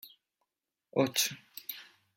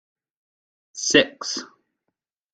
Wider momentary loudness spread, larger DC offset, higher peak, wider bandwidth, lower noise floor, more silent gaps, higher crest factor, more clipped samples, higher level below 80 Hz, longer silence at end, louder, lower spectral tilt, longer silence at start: about the same, 15 LU vs 14 LU; neither; second, -14 dBFS vs -2 dBFS; first, 16.5 kHz vs 9.4 kHz; first, -87 dBFS vs -81 dBFS; neither; about the same, 24 dB vs 26 dB; neither; second, -84 dBFS vs -64 dBFS; second, 0.35 s vs 0.85 s; second, -32 LUFS vs -21 LUFS; first, -3 dB/octave vs -1.5 dB/octave; second, 0.05 s vs 0.95 s